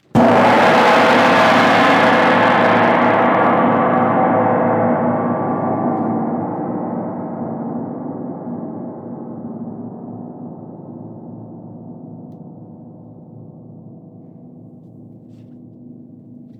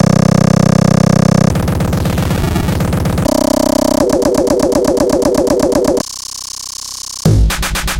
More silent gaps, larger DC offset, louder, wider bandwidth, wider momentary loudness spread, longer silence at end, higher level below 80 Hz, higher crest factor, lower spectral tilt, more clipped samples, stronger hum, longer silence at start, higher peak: neither; neither; about the same, -14 LUFS vs -13 LUFS; second, 13.5 kHz vs 17 kHz; first, 23 LU vs 12 LU; first, 0.15 s vs 0 s; second, -58 dBFS vs -24 dBFS; about the same, 14 dB vs 12 dB; about the same, -6 dB/octave vs -6 dB/octave; neither; neither; first, 0.15 s vs 0 s; about the same, -2 dBFS vs 0 dBFS